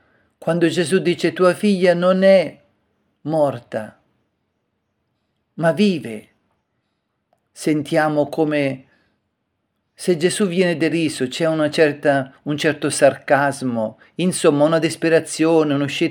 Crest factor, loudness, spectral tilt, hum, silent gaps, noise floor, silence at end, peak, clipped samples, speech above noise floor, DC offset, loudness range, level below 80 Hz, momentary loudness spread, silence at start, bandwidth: 18 dB; -18 LUFS; -5.5 dB/octave; none; none; -72 dBFS; 0 s; 0 dBFS; under 0.1%; 55 dB; under 0.1%; 8 LU; -70 dBFS; 11 LU; 0.4 s; 17.5 kHz